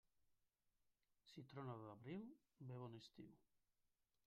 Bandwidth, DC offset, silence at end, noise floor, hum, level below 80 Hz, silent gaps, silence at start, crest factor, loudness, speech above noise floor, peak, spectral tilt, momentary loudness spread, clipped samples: 6.8 kHz; under 0.1%; 0.8 s; -88 dBFS; none; -90 dBFS; none; 0.25 s; 20 dB; -58 LUFS; 31 dB; -40 dBFS; -6.5 dB/octave; 10 LU; under 0.1%